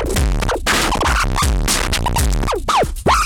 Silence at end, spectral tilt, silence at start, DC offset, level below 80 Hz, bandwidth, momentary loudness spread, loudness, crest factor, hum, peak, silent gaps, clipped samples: 0 s; -3.5 dB/octave; 0 s; under 0.1%; -20 dBFS; 18 kHz; 3 LU; -17 LUFS; 10 dB; none; -6 dBFS; none; under 0.1%